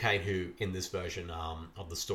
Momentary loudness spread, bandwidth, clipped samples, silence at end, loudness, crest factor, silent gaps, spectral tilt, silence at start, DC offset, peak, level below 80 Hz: 10 LU; 16.5 kHz; under 0.1%; 0 s; -36 LUFS; 20 dB; none; -4 dB/octave; 0 s; under 0.1%; -14 dBFS; -52 dBFS